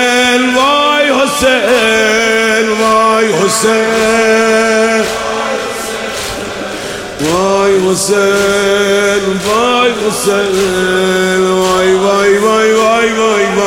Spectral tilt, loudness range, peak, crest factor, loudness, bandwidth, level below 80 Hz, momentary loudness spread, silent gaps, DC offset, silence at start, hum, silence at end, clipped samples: -3 dB/octave; 4 LU; 0 dBFS; 10 dB; -10 LUFS; 16.5 kHz; -40 dBFS; 8 LU; none; under 0.1%; 0 s; none; 0 s; under 0.1%